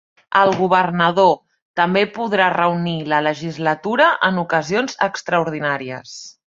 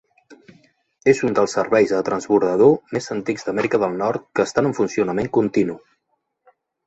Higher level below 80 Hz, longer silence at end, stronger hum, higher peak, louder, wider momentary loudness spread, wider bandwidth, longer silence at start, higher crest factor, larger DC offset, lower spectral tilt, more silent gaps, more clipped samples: about the same, -60 dBFS vs -58 dBFS; second, 0.15 s vs 1.1 s; neither; about the same, -2 dBFS vs -2 dBFS; about the same, -18 LUFS vs -20 LUFS; about the same, 8 LU vs 9 LU; about the same, 7.8 kHz vs 8.2 kHz; about the same, 0.3 s vs 0.3 s; about the same, 18 dB vs 18 dB; neither; about the same, -5 dB/octave vs -6 dB/octave; first, 1.62-1.74 s vs none; neither